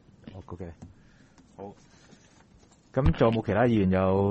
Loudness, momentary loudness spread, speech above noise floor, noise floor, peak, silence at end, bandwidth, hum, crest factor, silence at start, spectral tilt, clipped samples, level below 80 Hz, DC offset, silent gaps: -25 LUFS; 22 LU; 33 dB; -58 dBFS; -8 dBFS; 0 s; 8.2 kHz; none; 20 dB; 0.25 s; -9 dB/octave; under 0.1%; -42 dBFS; under 0.1%; none